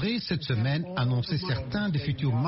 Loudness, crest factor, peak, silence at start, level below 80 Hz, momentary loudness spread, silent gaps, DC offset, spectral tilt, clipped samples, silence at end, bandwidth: -28 LUFS; 12 dB; -16 dBFS; 0 s; -52 dBFS; 2 LU; none; under 0.1%; -5.5 dB/octave; under 0.1%; 0 s; 6 kHz